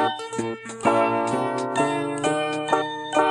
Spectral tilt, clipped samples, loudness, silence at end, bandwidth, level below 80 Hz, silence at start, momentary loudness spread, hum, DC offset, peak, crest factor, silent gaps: -4.5 dB/octave; under 0.1%; -24 LUFS; 0 s; 12 kHz; -66 dBFS; 0 s; 8 LU; none; under 0.1%; -6 dBFS; 18 dB; none